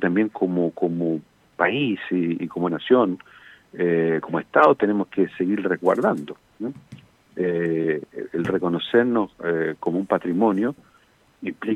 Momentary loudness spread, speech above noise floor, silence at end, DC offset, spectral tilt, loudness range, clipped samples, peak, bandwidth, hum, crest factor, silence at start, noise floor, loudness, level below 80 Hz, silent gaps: 14 LU; 36 dB; 0 s; under 0.1%; -8 dB/octave; 3 LU; under 0.1%; -2 dBFS; 9.8 kHz; none; 20 dB; 0 s; -58 dBFS; -22 LUFS; -66 dBFS; none